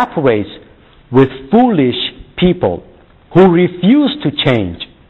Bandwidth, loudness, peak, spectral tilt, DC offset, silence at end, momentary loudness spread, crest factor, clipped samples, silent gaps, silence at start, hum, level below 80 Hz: 5.2 kHz; -13 LUFS; 0 dBFS; -9 dB/octave; 0.2%; 0.25 s; 10 LU; 12 dB; under 0.1%; none; 0 s; none; -40 dBFS